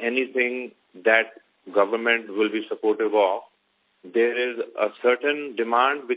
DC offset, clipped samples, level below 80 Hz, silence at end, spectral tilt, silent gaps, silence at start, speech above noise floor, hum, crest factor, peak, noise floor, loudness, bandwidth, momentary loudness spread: under 0.1%; under 0.1%; -80 dBFS; 0 s; -7 dB/octave; none; 0 s; 45 dB; none; 20 dB; -4 dBFS; -68 dBFS; -23 LUFS; 4 kHz; 7 LU